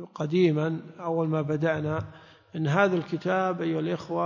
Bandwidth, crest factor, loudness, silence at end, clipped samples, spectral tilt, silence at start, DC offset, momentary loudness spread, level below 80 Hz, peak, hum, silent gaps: 7.2 kHz; 18 dB; -27 LUFS; 0 s; under 0.1%; -8 dB/octave; 0 s; under 0.1%; 9 LU; -60 dBFS; -8 dBFS; none; none